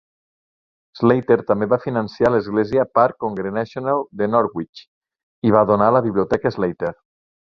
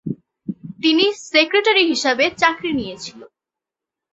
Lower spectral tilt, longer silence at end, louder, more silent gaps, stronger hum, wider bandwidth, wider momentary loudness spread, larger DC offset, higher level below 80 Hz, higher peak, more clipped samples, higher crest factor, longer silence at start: first, -9 dB/octave vs -3.5 dB/octave; second, 0.6 s vs 0.85 s; about the same, -19 LUFS vs -17 LUFS; first, 4.69-4.73 s, 4.88-5.01 s, 5.23-5.42 s vs none; neither; second, 7 kHz vs 8.2 kHz; second, 9 LU vs 18 LU; neither; first, -52 dBFS vs -58 dBFS; about the same, -2 dBFS vs -2 dBFS; neither; about the same, 18 dB vs 18 dB; first, 0.95 s vs 0.05 s